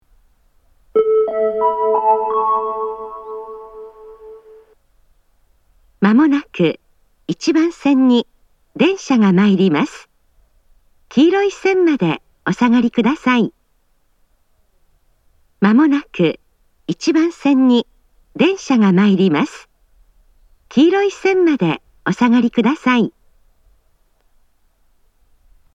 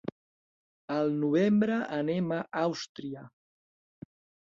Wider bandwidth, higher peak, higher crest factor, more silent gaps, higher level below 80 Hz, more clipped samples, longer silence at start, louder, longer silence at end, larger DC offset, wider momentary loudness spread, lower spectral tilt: about the same, 8 kHz vs 7.6 kHz; first, 0 dBFS vs -14 dBFS; about the same, 16 dB vs 16 dB; second, none vs 0.12-0.88 s, 2.89-2.95 s; first, -56 dBFS vs -72 dBFS; neither; first, 0.95 s vs 0.05 s; first, -16 LUFS vs -29 LUFS; first, 2.65 s vs 1.2 s; neither; about the same, 16 LU vs 16 LU; about the same, -6.5 dB/octave vs -7 dB/octave